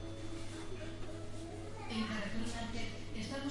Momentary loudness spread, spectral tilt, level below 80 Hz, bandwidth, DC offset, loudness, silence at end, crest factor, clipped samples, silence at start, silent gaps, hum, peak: 8 LU; -5 dB/octave; -50 dBFS; 11.5 kHz; under 0.1%; -43 LUFS; 0 s; 14 dB; under 0.1%; 0 s; none; none; -26 dBFS